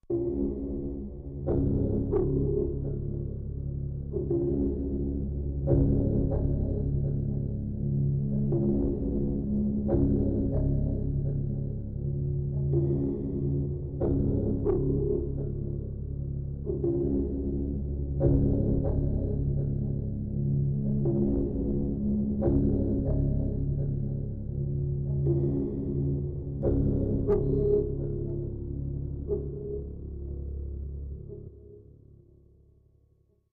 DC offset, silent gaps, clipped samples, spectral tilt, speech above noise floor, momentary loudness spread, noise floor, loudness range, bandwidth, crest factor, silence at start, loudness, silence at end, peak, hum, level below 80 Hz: under 0.1%; none; under 0.1%; -15 dB/octave; 40 dB; 9 LU; -66 dBFS; 4 LU; 1.7 kHz; 16 dB; 0.1 s; -30 LUFS; 1.7 s; -12 dBFS; none; -36 dBFS